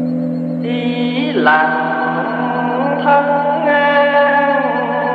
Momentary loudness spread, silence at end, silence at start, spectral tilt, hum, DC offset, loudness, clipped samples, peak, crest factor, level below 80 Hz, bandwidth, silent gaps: 7 LU; 0 s; 0 s; -8 dB/octave; none; under 0.1%; -14 LUFS; under 0.1%; 0 dBFS; 14 dB; -68 dBFS; 5.2 kHz; none